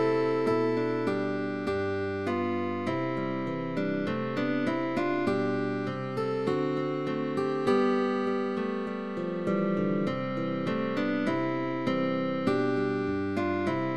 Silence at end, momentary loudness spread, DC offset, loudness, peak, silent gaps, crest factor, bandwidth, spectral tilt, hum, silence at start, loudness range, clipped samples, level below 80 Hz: 0 s; 5 LU; 0.3%; -29 LUFS; -14 dBFS; none; 14 dB; 11 kHz; -7.5 dB/octave; none; 0 s; 2 LU; under 0.1%; -64 dBFS